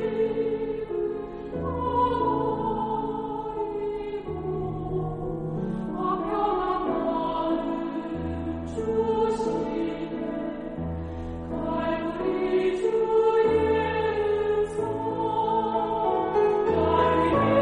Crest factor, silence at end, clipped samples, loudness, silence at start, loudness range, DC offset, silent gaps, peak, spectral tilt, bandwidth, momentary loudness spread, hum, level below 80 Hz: 16 dB; 0 s; under 0.1%; -27 LUFS; 0 s; 5 LU; under 0.1%; none; -10 dBFS; -7.5 dB/octave; 9.8 kHz; 10 LU; none; -46 dBFS